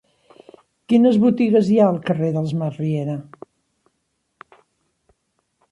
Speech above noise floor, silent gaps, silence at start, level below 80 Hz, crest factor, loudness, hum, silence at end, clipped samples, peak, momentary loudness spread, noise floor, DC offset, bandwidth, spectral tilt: 55 dB; none; 0.9 s; -64 dBFS; 16 dB; -18 LUFS; none; 2.5 s; under 0.1%; -4 dBFS; 10 LU; -72 dBFS; under 0.1%; 8.2 kHz; -9 dB/octave